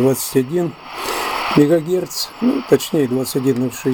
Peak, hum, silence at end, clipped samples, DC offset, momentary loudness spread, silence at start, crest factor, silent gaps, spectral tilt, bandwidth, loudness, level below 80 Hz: 0 dBFS; none; 0 s; under 0.1%; under 0.1%; 8 LU; 0 s; 18 dB; none; -5 dB/octave; 17.5 kHz; -18 LUFS; -52 dBFS